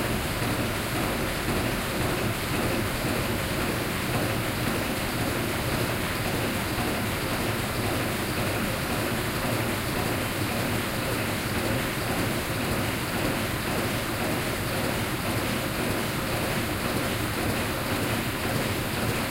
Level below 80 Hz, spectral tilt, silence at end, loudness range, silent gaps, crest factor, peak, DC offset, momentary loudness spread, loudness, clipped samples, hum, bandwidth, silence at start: -40 dBFS; -4.5 dB/octave; 0 s; 0 LU; none; 16 dB; -12 dBFS; under 0.1%; 1 LU; -27 LUFS; under 0.1%; none; 16 kHz; 0 s